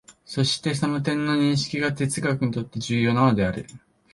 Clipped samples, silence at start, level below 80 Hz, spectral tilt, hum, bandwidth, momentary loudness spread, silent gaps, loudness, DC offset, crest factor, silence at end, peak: under 0.1%; 0.1 s; -52 dBFS; -5.5 dB/octave; none; 11.5 kHz; 8 LU; none; -23 LUFS; under 0.1%; 18 dB; 0.35 s; -6 dBFS